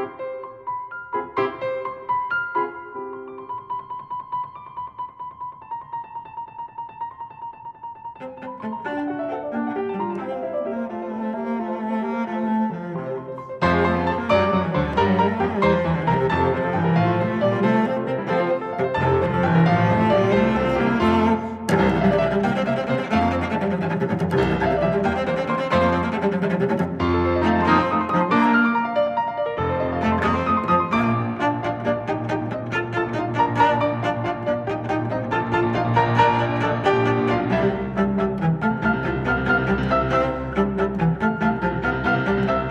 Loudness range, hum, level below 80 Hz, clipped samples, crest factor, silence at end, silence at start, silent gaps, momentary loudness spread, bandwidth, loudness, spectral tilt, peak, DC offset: 11 LU; none; -42 dBFS; under 0.1%; 18 dB; 0 s; 0 s; none; 15 LU; 11 kHz; -21 LUFS; -8 dB/octave; -4 dBFS; under 0.1%